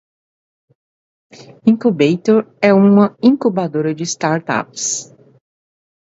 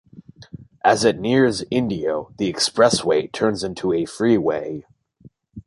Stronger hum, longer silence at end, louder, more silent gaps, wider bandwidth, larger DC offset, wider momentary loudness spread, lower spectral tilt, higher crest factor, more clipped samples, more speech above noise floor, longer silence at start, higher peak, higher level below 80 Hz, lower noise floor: neither; first, 1 s vs 0.05 s; first, -15 LUFS vs -20 LUFS; neither; second, 8 kHz vs 11.5 kHz; neither; about the same, 9 LU vs 8 LU; about the same, -5.5 dB/octave vs -4.5 dB/octave; about the same, 16 dB vs 18 dB; neither; first, over 76 dB vs 31 dB; first, 1.4 s vs 0.15 s; about the same, 0 dBFS vs -2 dBFS; second, -62 dBFS vs -52 dBFS; first, under -90 dBFS vs -51 dBFS